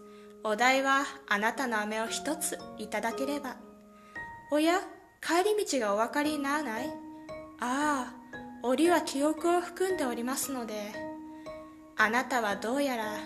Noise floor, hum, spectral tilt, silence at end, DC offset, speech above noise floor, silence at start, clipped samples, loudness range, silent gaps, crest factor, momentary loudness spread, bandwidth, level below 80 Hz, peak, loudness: -53 dBFS; none; -2.5 dB/octave; 0 s; under 0.1%; 23 dB; 0 s; under 0.1%; 3 LU; none; 20 dB; 18 LU; 14 kHz; -66 dBFS; -10 dBFS; -30 LUFS